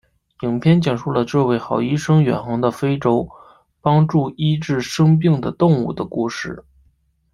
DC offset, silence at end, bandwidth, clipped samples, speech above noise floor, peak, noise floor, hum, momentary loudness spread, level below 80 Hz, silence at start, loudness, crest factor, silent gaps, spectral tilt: under 0.1%; 0.75 s; 11.5 kHz; under 0.1%; 43 dB; -2 dBFS; -60 dBFS; none; 8 LU; -50 dBFS; 0.4 s; -18 LUFS; 16 dB; none; -7.5 dB/octave